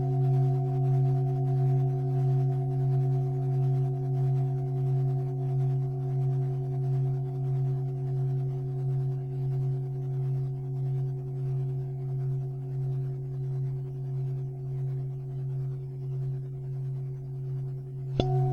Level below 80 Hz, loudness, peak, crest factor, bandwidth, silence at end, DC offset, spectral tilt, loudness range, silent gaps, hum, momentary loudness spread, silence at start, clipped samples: -54 dBFS; -30 LUFS; -8 dBFS; 20 dB; 4 kHz; 0 s; under 0.1%; -10.5 dB/octave; 7 LU; none; none; 8 LU; 0 s; under 0.1%